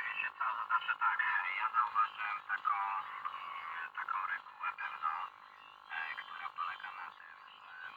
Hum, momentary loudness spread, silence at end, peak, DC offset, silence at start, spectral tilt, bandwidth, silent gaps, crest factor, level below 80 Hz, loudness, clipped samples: none; 17 LU; 0 s; -20 dBFS; under 0.1%; 0 s; -1 dB/octave; 16.5 kHz; none; 18 dB; under -90 dBFS; -37 LUFS; under 0.1%